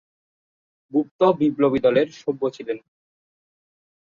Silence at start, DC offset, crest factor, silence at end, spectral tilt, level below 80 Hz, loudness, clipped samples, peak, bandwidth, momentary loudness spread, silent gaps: 0.95 s; under 0.1%; 18 dB; 1.4 s; -7.5 dB/octave; -64 dBFS; -21 LUFS; under 0.1%; -6 dBFS; 7.2 kHz; 12 LU; 1.11-1.19 s